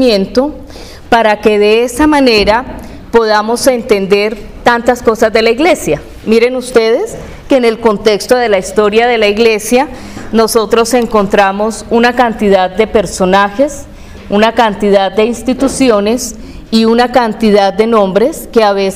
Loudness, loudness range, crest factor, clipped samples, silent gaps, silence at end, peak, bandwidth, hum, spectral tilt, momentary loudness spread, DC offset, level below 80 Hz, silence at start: -10 LUFS; 1 LU; 10 dB; 0.8%; none; 0 s; 0 dBFS; 16 kHz; none; -4.5 dB/octave; 7 LU; 0.3%; -34 dBFS; 0 s